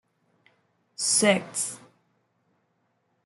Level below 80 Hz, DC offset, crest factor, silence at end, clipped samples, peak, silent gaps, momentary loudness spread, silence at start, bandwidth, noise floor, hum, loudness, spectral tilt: -76 dBFS; under 0.1%; 24 dB; 1.5 s; under 0.1%; -8 dBFS; none; 23 LU; 1 s; 12 kHz; -72 dBFS; none; -24 LUFS; -2 dB/octave